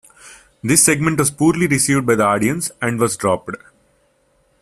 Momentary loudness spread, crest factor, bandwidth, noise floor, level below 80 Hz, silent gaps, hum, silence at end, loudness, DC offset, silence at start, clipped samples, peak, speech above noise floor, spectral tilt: 10 LU; 18 dB; 15 kHz; -60 dBFS; -50 dBFS; none; none; 1.05 s; -16 LUFS; under 0.1%; 0.25 s; under 0.1%; 0 dBFS; 43 dB; -4 dB/octave